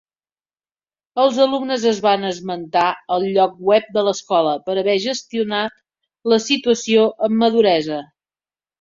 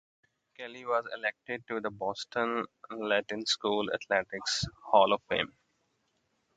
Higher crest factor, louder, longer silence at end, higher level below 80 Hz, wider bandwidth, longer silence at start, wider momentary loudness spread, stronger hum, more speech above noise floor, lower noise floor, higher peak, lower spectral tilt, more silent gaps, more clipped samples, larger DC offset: second, 16 dB vs 24 dB; first, -18 LUFS vs -31 LUFS; second, 0.8 s vs 1.1 s; about the same, -64 dBFS vs -64 dBFS; second, 7.6 kHz vs 9.4 kHz; first, 1.15 s vs 0.6 s; second, 8 LU vs 13 LU; neither; first, over 73 dB vs 45 dB; first, under -90 dBFS vs -76 dBFS; first, -2 dBFS vs -8 dBFS; about the same, -4 dB/octave vs -3 dB/octave; neither; neither; neither